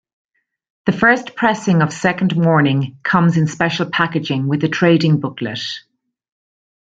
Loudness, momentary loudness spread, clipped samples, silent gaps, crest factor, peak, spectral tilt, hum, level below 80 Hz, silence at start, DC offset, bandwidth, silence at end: -16 LUFS; 9 LU; under 0.1%; none; 16 dB; -2 dBFS; -6.5 dB/octave; none; -56 dBFS; 0.85 s; under 0.1%; 7.8 kHz; 1.2 s